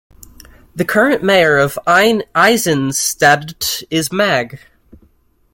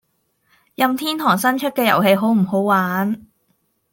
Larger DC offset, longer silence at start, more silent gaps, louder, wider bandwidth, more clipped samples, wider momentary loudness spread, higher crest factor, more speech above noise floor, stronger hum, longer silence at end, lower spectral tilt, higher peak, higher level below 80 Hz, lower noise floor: neither; about the same, 0.75 s vs 0.8 s; neither; first, -13 LUFS vs -17 LUFS; about the same, 17 kHz vs 17 kHz; neither; about the same, 8 LU vs 6 LU; about the same, 16 dB vs 18 dB; second, 40 dB vs 49 dB; neither; first, 0.95 s vs 0.75 s; second, -3.5 dB/octave vs -5.5 dB/octave; about the same, 0 dBFS vs -2 dBFS; first, -48 dBFS vs -64 dBFS; second, -54 dBFS vs -66 dBFS